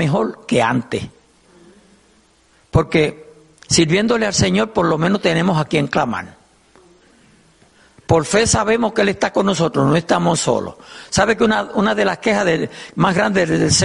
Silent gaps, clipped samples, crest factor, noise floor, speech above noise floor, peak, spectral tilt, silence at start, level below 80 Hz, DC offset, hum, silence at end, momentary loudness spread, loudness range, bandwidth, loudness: none; under 0.1%; 16 dB; -55 dBFS; 38 dB; 0 dBFS; -4.5 dB/octave; 0 s; -42 dBFS; under 0.1%; none; 0 s; 7 LU; 4 LU; 11.5 kHz; -17 LUFS